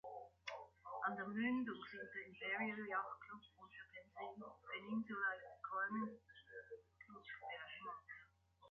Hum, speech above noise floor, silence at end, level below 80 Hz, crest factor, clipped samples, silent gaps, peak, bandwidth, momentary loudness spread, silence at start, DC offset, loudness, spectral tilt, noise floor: none; 23 dB; 0 s; -82 dBFS; 18 dB; under 0.1%; none; -30 dBFS; 6.8 kHz; 16 LU; 0.05 s; under 0.1%; -47 LUFS; -3 dB/octave; -70 dBFS